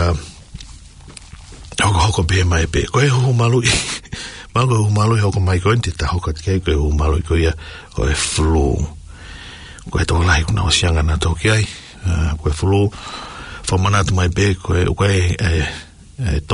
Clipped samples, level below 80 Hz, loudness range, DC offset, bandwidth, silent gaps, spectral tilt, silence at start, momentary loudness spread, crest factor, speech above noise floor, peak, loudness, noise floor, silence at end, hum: under 0.1%; -28 dBFS; 3 LU; under 0.1%; 11 kHz; none; -5 dB/octave; 0 s; 17 LU; 16 dB; 22 dB; -2 dBFS; -17 LUFS; -38 dBFS; 0 s; none